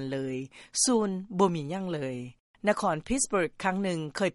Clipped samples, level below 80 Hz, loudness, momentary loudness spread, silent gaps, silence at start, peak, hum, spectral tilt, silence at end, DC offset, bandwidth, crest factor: under 0.1%; -54 dBFS; -29 LUFS; 11 LU; 2.40-2.54 s; 0 s; -10 dBFS; none; -4 dB/octave; 0.05 s; under 0.1%; 11.5 kHz; 18 dB